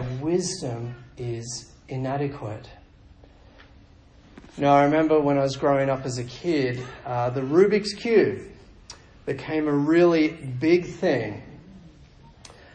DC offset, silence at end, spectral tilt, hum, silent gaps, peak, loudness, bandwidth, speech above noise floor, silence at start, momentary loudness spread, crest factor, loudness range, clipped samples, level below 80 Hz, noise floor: under 0.1%; 0.2 s; -6 dB/octave; none; none; -6 dBFS; -23 LUFS; 9.4 kHz; 29 dB; 0 s; 18 LU; 18 dB; 11 LU; under 0.1%; -54 dBFS; -52 dBFS